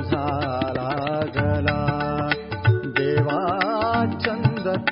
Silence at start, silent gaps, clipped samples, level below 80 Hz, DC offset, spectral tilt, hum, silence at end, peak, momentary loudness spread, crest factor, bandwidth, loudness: 0 s; none; under 0.1%; -46 dBFS; under 0.1%; -11.5 dB/octave; none; 0 s; -4 dBFS; 4 LU; 18 dB; 5.6 kHz; -23 LUFS